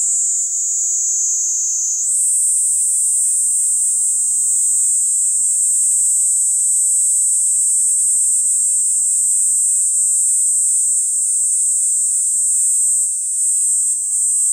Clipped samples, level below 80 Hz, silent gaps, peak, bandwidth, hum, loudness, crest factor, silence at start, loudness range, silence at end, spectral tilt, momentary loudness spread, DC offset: under 0.1%; -80 dBFS; none; -4 dBFS; 16 kHz; none; -12 LUFS; 12 dB; 0 s; 1 LU; 0 s; 10.5 dB/octave; 3 LU; under 0.1%